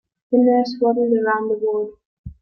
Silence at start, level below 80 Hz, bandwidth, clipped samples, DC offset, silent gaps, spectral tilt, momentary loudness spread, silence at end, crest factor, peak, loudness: 0.3 s; -52 dBFS; 6.4 kHz; under 0.1%; under 0.1%; 2.05-2.24 s; -7.5 dB/octave; 8 LU; 0.1 s; 14 dB; -6 dBFS; -19 LUFS